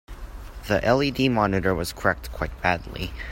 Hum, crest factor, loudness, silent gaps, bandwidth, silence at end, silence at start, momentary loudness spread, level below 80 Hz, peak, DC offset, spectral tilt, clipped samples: none; 20 dB; -24 LUFS; none; 16.5 kHz; 0 s; 0.1 s; 19 LU; -38 dBFS; -4 dBFS; under 0.1%; -5.5 dB/octave; under 0.1%